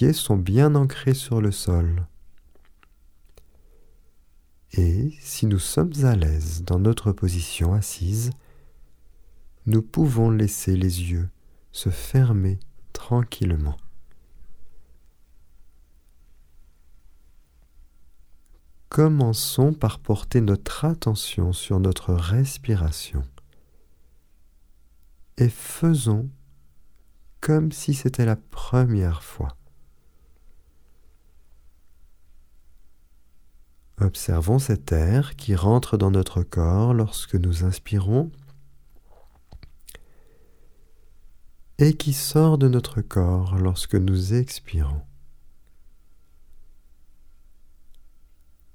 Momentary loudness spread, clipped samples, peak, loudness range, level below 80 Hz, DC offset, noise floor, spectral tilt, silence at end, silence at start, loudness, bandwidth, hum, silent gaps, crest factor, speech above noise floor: 10 LU; under 0.1%; -4 dBFS; 8 LU; -36 dBFS; under 0.1%; -54 dBFS; -6.5 dB/octave; 0.65 s; 0 s; -23 LUFS; 17.5 kHz; none; none; 20 dB; 33 dB